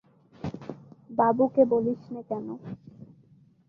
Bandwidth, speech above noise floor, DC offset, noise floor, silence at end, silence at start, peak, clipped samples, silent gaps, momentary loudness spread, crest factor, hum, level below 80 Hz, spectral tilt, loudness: 6.4 kHz; 33 dB; under 0.1%; -59 dBFS; 0.65 s; 0.45 s; -8 dBFS; under 0.1%; none; 21 LU; 20 dB; none; -64 dBFS; -10 dB/octave; -26 LUFS